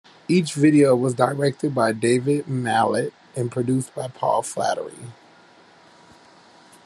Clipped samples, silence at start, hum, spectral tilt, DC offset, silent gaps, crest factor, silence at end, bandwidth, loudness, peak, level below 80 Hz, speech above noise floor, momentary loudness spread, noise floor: under 0.1%; 0.3 s; none; -6 dB/octave; under 0.1%; none; 20 dB; 1.75 s; 12.5 kHz; -21 LUFS; -2 dBFS; -66 dBFS; 31 dB; 13 LU; -51 dBFS